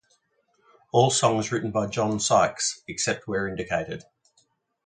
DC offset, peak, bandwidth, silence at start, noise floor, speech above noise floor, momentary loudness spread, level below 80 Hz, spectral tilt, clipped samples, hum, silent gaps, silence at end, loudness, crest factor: under 0.1%; -6 dBFS; 9.6 kHz; 0.95 s; -69 dBFS; 44 dB; 8 LU; -56 dBFS; -3.5 dB/octave; under 0.1%; none; none; 0.85 s; -24 LUFS; 20 dB